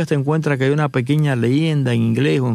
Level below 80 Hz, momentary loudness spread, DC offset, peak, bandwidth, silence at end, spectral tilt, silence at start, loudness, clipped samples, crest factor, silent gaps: -60 dBFS; 1 LU; under 0.1%; -4 dBFS; 12 kHz; 0 s; -7.5 dB/octave; 0 s; -18 LUFS; under 0.1%; 12 dB; none